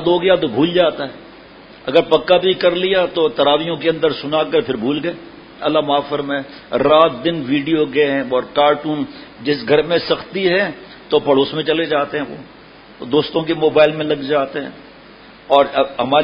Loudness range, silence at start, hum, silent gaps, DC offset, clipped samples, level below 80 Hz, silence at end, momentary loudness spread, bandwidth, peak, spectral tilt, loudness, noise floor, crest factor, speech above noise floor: 3 LU; 0 s; none; none; under 0.1%; under 0.1%; -52 dBFS; 0 s; 11 LU; 5.4 kHz; 0 dBFS; -8 dB/octave; -16 LUFS; -41 dBFS; 16 dB; 25 dB